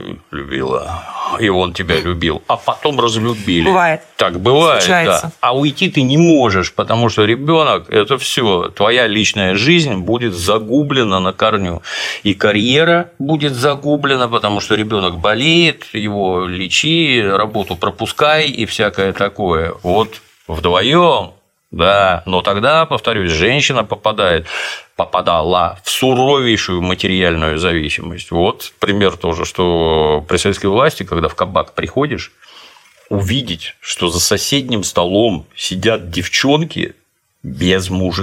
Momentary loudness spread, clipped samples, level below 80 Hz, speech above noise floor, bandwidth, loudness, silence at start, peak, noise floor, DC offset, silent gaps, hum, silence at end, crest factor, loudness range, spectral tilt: 9 LU; under 0.1%; -42 dBFS; 28 dB; 16.5 kHz; -14 LUFS; 0 s; 0 dBFS; -43 dBFS; under 0.1%; none; none; 0 s; 14 dB; 4 LU; -4.5 dB/octave